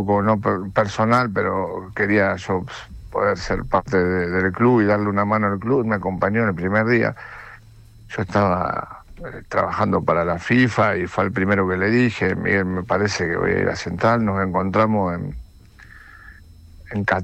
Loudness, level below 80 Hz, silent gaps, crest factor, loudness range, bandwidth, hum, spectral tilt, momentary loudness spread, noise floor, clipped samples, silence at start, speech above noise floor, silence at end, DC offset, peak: -20 LUFS; -44 dBFS; none; 16 dB; 4 LU; 9 kHz; none; -7 dB/octave; 11 LU; -45 dBFS; under 0.1%; 0 s; 25 dB; 0 s; under 0.1%; -6 dBFS